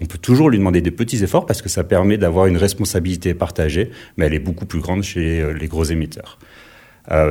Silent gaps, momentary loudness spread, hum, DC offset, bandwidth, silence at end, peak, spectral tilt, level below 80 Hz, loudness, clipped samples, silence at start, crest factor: none; 9 LU; none; under 0.1%; 17 kHz; 0 s; -2 dBFS; -6 dB/octave; -30 dBFS; -18 LUFS; under 0.1%; 0 s; 16 dB